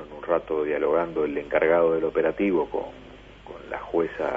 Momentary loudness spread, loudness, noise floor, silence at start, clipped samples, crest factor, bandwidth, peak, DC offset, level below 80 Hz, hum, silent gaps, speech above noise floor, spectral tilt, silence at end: 16 LU; -24 LUFS; -44 dBFS; 0 s; under 0.1%; 16 dB; 5.4 kHz; -8 dBFS; under 0.1%; -52 dBFS; 50 Hz at -50 dBFS; none; 20 dB; -8 dB/octave; 0 s